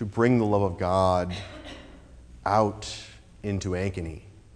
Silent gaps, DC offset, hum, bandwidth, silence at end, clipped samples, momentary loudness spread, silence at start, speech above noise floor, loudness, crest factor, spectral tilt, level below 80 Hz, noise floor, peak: none; under 0.1%; none; 11 kHz; 0.25 s; under 0.1%; 20 LU; 0 s; 22 dB; -26 LUFS; 20 dB; -6.5 dB/octave; -48 dBFS; -48 dBFS; -8 dBFS